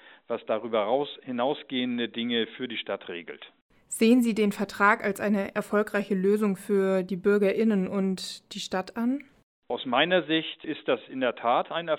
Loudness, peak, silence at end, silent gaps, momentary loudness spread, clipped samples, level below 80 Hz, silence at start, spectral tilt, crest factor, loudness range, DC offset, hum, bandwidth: -27 LUFS; -8 dBFS; 0 s; 3.61-3.70 s, 9.43-9.62 s; 12 LU; under 0.1%; -70 dBFS; 0.3 s; -5 dB/octave; 20 dB; 4 LU; under 0.1%; none; 16.5 kHz